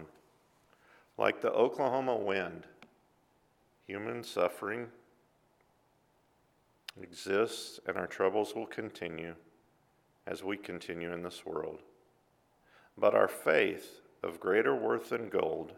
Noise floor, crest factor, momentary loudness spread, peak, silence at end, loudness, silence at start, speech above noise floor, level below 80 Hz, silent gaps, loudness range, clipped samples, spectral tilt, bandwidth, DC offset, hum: -71 dBFS; 24 dB; 17 LU; -10 dBFS; 0 s; -33 LUFS; 0 s; 38 dB; -76 dBFS; none; 10 LU; under 0.1%; -4.5 dB/octave; 16.5 kHz; under 0.1%; none